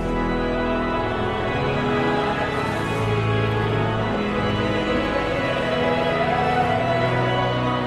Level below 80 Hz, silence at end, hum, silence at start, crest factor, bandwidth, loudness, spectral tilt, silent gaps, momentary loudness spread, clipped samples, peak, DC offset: -36 dBFS; 0 s; none; 0 s; 14 dB; 12.5 kHz; -22 LUFS; -6.5 dB/octave; none; 3 LU; under 0.1%; -8 dBFS; under 0.1%